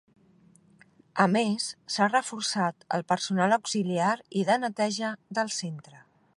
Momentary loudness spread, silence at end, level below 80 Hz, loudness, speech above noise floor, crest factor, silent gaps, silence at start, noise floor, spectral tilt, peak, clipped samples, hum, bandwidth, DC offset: 8 LU; 0.4 s; -78 dBFS; -27 LUFS; 32 dB; 22 dB; none; 1.15 s; -60 dBFS; -4 dB/octave; -8 dBFS; under 0.1%; none; 11.5 kHz; under 0.1%